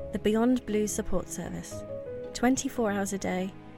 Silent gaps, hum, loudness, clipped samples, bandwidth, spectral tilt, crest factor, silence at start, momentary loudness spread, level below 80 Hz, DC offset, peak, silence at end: none; none; -30 LUFS; under 0.1%; 17 kHz; -5 dB/octave; 16 dB; 0 s; 12 LU; -46 dBFS; under 0.1%; -12 dBFS; 0 s